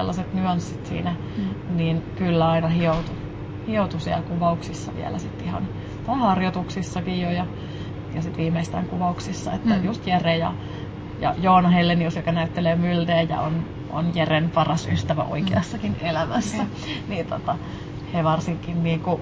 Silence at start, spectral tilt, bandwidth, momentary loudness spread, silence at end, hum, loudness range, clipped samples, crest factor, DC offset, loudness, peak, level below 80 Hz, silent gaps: 0 s; -7 dB/octave; 8 kHz; 10 LU; 0 s; none; 5 LU; under 0.1%; 18 dB; under 0.1%; -24 LUFS; -4 dBFS; -42 dBFS; none